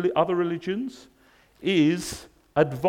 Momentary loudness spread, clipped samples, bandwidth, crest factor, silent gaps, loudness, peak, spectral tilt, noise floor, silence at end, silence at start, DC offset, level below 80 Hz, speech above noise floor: 13 LU; under 0.1%; 16.5 kHz; 18 dB; none; -25 LUFS; -8 dBFS; -5.5 dB/octave; -58 dBFS; 0 s; 0 s; under 0.1%; -58 dBFS; 34 dB